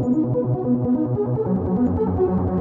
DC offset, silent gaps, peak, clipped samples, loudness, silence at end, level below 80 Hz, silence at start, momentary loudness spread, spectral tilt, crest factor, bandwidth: under 0.1%; none; -10 dBFS; under 0.1%; -21 LUFS; 0 s; -42 dBFS; 0 s; 2 LU; -13 dB/octave; 10 dB; 2.6 kHz